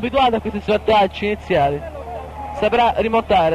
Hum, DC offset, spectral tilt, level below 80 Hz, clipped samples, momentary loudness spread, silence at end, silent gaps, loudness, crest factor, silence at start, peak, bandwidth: none; under 0.1%; -6.5 dB/octave; -38 dBFS; under 0.1%; 14 LU; 0 s; none; -18 LUFS; 12 dB; 0 s; -6 dBFS; 13.5 kHz